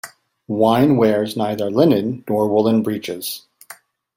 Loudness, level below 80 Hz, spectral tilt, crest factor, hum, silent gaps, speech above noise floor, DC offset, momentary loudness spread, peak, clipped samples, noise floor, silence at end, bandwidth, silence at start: -18 LUFS; -58 dBFS; -6.5 dB/octave; 16 dB; none; none; 27 dB; under 0.1%; 13 LU; -2 dBFS; under 0.1%; -44 dBFS; 0.45 s; 16.5 kHz; 0.05 s